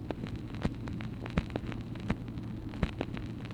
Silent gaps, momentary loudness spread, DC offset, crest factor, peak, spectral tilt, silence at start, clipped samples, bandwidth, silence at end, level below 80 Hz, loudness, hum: none; 5 LU; under 0.1%; 24 dB; -12 dBFS; -7.5 dB/octave; 0 s; under 0.1%; 11.5 kHz; 0 s; -44 dBFS; -38 LUFS; none